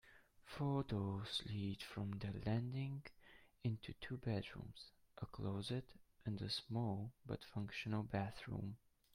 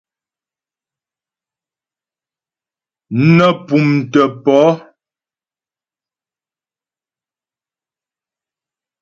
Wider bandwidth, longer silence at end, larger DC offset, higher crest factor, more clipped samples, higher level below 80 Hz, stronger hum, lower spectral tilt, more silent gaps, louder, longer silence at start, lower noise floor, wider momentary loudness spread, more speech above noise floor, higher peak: first, 15 kHz vs 7.4 kHz; second, 0.4 s vs 4.2 s; neither; about the same, 20 dB vs 18 dB; neither; second, -66 dBFS vs -58 dBFS; neither; about the same, -6.5 dB/octave vs -7.5 dB/octave; neither; second, -46 LUFS vs -13 LUFS; second, 0.05 s vs 3.1 s; second, -65 dBFS vs under -90 dBFS; first, 12 LU vs 6 LU; second, 20 dB vs over 78 dB; second, -26 dBFS vs 0 dBFS